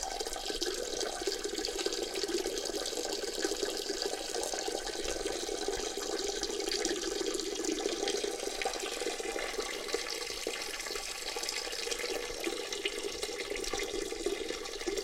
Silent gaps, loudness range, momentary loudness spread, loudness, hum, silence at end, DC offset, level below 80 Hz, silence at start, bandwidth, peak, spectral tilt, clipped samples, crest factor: none; 2 LU; 3 LU; -35 LUFS; none; 0 s; under 0.1%; -54 dBFS; 0 s; 17 kHz; -16 dBFS; -1 dB/octave; under 0.1%; 20 dB